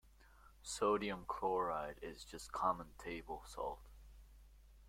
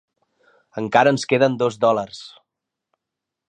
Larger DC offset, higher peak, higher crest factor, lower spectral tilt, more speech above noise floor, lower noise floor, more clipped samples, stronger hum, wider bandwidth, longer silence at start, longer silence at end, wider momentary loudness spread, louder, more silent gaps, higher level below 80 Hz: neither; second, -22 dBFS vs 0 dBFS; about the same, 20 dB vs 22 dB; second, -4 dB/octave vs -5.5 dB/octave; second, 23 dB vs 65 dB; second, -64 dBFS vs -84 dBFS; neither; neither; first, 16.5 kHz vs 9.6 kHz; second, 0.05 s vs 0.75 s; second, 0 s vs 1.2 s; second, 14 LU vs 18 LU; second, -42 LUFS vs -19 LUFS; neither; first, -60 dBFS vs -66 dBFS